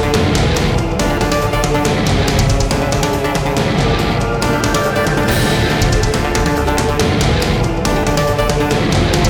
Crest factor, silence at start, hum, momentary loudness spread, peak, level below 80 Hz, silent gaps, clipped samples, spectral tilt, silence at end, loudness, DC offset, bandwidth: 12 dB; 0 s; none; 2 LU; -2 dBFS; -22 dBFS; none; under 0.1%; -5 dB/octave; 0 s; -15 LUFS; under 0.1%; over 20 kHz